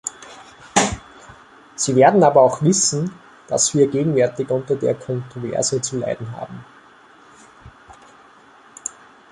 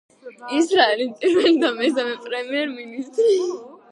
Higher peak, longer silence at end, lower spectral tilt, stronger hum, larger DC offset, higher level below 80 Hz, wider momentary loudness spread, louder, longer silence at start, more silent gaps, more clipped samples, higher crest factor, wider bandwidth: about the same, -2 dBFS vs -2 dBFS; first, 0.4 s vs 0.15 s; first, -4.5 dB/octave vs -2.5 dB/octave; neither; neither; first, -50 dBFS vs -72 dBFS; first, 19 LU vs 12 LU; about the same, -18 LUFS vs -20 LUFS; second, 0.05 s vs 0.25 s; neither; neither; about the same, 20 dB vs 18 dB; about the same, 11.5 kHz vs 11 kHz